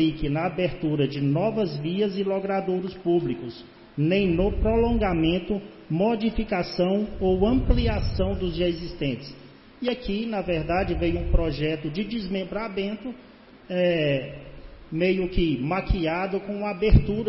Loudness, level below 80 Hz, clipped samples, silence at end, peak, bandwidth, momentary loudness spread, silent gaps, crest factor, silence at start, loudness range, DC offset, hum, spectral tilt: -25 LUFS; -32 dBFS; under 0.1%; 0 s; -4 dBFS; 5.8 kHz; 9 LU; none; 20 dB; 0 s; 3 LU; under 0.1%; none; -10.5 dB/octave